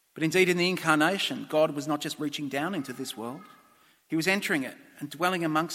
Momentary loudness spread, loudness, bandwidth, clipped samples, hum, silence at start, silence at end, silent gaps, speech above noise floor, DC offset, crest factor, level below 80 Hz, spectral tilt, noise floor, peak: 14 LU; -27 LUFS; 16.5 kHz; under 0.1%; none; 0.15 s; 0 s; none; 33 dB; under 0.1%; 22 dB; -74 dBFS; -4.5 dB/octave; -61 dBFS; -6 dBFS